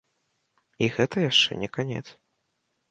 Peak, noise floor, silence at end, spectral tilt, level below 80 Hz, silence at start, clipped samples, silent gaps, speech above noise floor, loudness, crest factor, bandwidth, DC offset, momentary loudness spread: -8 dBFS; -76 dBFS; 0.8 s; -4.5 dB/octave; -62 dBFS; 0.8 s; under 0.1%; none; 51 dB; -24 LUFS; 22 dB; 9.6 kHz; under 0.1%; 12 LU